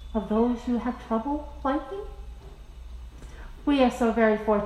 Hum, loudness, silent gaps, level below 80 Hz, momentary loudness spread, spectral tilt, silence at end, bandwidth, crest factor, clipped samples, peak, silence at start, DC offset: none; -26 LUFS; none; -42 dBFS; 23 LU; -6.5 dB/octave; 0 s; 12.5 kHz; 18 dB; under 0.1%; -8 dBFS; 0 s; under 0.1%